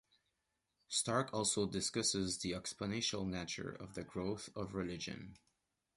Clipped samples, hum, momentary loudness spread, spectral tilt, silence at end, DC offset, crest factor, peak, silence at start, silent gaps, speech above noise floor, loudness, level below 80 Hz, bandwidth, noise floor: under 0.1%; none; 11 LU; -3.5 dB/octave; 0.6 s; under 0.1%; 20 dB; -22 dBFS; 0.9 s; none; 46 dB; -39 LUFS; -64 dBFS; 11.5 kHz; -86 dBFS